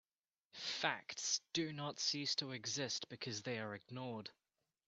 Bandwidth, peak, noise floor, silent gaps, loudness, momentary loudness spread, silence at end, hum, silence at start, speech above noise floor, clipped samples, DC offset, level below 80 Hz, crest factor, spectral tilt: 8.6 kHz; -20 dBFS; under -90 dBFS; none; -41 LUFS; 10 LU; 0.55 s; none; 0.55 s; over 47 dB; under 0.1%; under 0.1%; -84 dBFS; 24 dB; -2.5 dB/octave